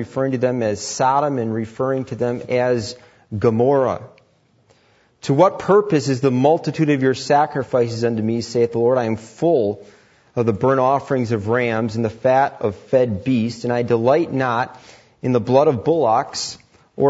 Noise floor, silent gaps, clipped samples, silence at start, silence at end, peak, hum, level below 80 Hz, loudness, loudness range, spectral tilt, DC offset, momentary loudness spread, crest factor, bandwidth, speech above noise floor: -58 dBFS; none; under 0.1%; 0 s; 0 s; -2 dBFS; none; -58 dBFS; -19 LUFS; 3 LU; -6.5 dB/octave; under 0.1%; 9 LU; 18 dB; 8 kHz; 40 dB